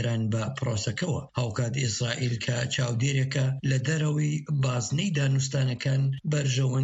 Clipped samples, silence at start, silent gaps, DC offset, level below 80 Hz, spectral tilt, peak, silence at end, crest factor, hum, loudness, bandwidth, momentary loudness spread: under 0.1%; 0 s; none; under 0.1%; -58 dBFS; -5 dB/octave; -12 dBFS; 0 s; 14 dB; none; -27 LUFS; 8.2 kHz; 4 LU